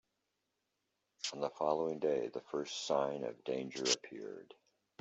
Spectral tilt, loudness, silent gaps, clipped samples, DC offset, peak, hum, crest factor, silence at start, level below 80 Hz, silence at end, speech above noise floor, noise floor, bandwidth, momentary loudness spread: -2.5 dB/octave; -38 LUFS; none; under 0.1%; under 0.1%; -18 dBFS; none; 22 dB; 1.2 s; -84 dBFS; 0.6 s; 48 dB; -86 dBFS; 8.2 kHz; 11 LU